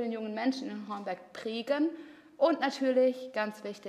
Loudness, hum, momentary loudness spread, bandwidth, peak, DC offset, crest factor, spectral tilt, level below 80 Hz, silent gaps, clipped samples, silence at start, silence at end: -32 LUFS; none; 12 LU; 12.5 kHz; -14 dBFS; under 0.1%; 18 dB; -5 dB/octave; -86 dBFS; none; under 0.1%; 0 s; 0 s